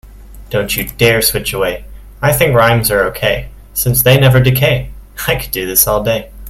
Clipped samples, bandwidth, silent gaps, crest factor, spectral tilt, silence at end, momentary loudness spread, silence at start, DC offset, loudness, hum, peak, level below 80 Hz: under 0.1%; 16.5 kHz; none; 14 dB; -4 dB/octave; 0 s; 10 LU; 0.05 s; under 0.1%; -12 LUFS; none; 0 dBFS; -30 dBFS